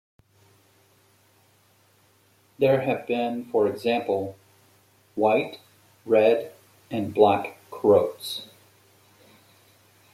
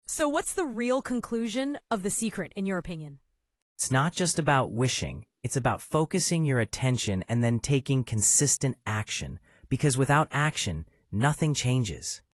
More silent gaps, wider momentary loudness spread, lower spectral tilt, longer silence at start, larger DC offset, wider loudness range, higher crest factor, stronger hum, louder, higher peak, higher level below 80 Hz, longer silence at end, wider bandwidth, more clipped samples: second, none vs 3.62-3.76 s; first, 16 LU vs 10 LU; first, -6 dB/octave vs -4.5 dB/octave; first, 2.6 s vs 0.1 s; neither; about the same, 4 LU vs 5 LU; about the same, 22 dB vs 20 dB; neither; first, -24 LUFS vs -27 LUFS; first, -4 dBFS vs -8 dBFS; second, -72 dBFS vs -52 dBFS; first, 1.7 s vs 0.15 s; first, 15.5 kHz vs 13.5 kHz; neither